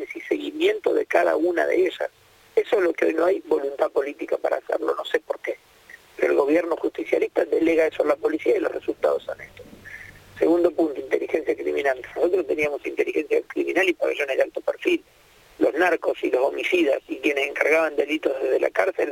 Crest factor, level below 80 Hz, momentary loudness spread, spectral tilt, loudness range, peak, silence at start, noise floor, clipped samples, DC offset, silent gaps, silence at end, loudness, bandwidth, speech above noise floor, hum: 20 dB; -62 dBFS; 7 LU; -4 dB/octave; 3 LU; -2 dBFS; 0 s; -49 dBFS; under 0.1%; under 0.1%; none; 0 s; -23 LUFS; 17 kHz; 26 dB; none